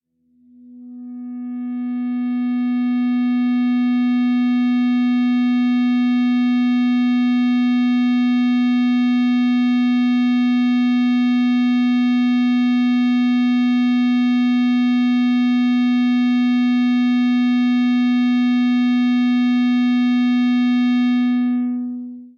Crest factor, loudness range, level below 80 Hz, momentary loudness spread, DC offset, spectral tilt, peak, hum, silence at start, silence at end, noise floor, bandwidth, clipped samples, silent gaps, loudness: 4 dB; 2 LU; -80 dBFS; 4 LU; under 0.1%; -5 dB/octave; -12 dBFS; none; 0.7 s; 0.1 s; -57 dBFS; 6 kHz; under 0.1%; none; -17 LUFS